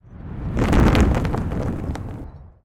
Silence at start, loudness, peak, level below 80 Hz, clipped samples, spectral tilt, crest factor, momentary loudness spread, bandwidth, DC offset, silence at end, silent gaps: 0.1 s; -21 LUFS; -2 dBFS; -26 dBFS; under 0.1%; -7 dB/octave; 18 dB; 19 LU; 15.5 kHz; under 0.1%; 0.2 s; none